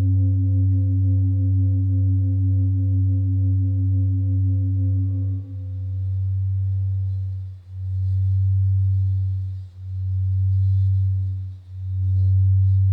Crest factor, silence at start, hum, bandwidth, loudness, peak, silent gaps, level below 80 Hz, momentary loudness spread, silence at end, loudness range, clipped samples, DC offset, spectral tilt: 8 dB; 0 s; none; 0.6 kHz; -22 LUFS; -12 dBFS; none; -54 dBFS; 10 LU; 0 s; 4 LU; under 0.1%; under 0.1%; -12.5 dB/octave